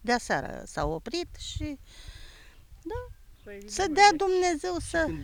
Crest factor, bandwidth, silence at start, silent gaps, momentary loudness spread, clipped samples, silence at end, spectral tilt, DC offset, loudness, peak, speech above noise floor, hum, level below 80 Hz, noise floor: 22 dB; 19 kHz; 0 s; none; 26 LU; under 0.1%; 0 s; -3.5 dB/octave; under 0.1%; -27 LUFS; -6 dBFS; 23 dB; none; -46 dBFS; -51 dBFS